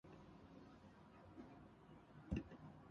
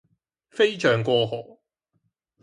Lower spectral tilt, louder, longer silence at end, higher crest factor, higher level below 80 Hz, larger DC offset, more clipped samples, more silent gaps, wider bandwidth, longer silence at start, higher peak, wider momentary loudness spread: first, -7.5 dB/octave vs -5.5 dB/octave; second, -57 LUFS vs -22 LUFS; second, 0 s vs 1 s; first, 26 dB vs 18 dB; about the same, -62 dBFS vs -66 dBFS; neither; neither; neither; second, 7.4 kHz vs 10.5 kHz; second, 0.05 s vs 0.55 s; second, -30 dBFS vs -8 dBFS; about the same, 15 LU vs 15 LU